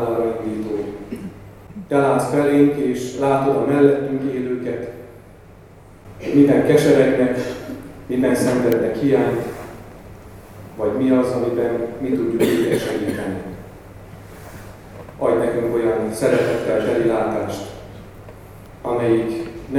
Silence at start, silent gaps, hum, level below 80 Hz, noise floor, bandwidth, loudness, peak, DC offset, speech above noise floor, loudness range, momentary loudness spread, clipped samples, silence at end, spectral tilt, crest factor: 0 s; none; none; -48 dBFS; -43 dBFS; 16.5 kHz; -19 LUFS; 0 dBFS; under 0.1%; 26 dB; 5 LU; 23 LU; under 0.1%; 0 s; -6.5 dB/octave; 20 dB